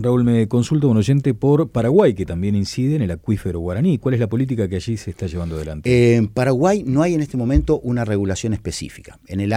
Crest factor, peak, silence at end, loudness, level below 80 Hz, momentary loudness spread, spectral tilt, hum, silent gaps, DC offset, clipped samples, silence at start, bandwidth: 14 dB; -4 dBFS; 0 s; -19 LUFS; -34 dBFS; 10 LU; -7.5 dB/octave; none; none; under 0.1%; under 0.1%; 0 s; 13.5 kHz